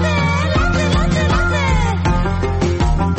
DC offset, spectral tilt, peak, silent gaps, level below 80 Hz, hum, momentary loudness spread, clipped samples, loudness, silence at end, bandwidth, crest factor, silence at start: under 0.1%; -6 dB/octave; -4 dBFS; none; -20 dBFS; none; 2 LU; under 0.1%; -16 LUFS; 0 s; 8.6 kHz; 10 dB; 0 s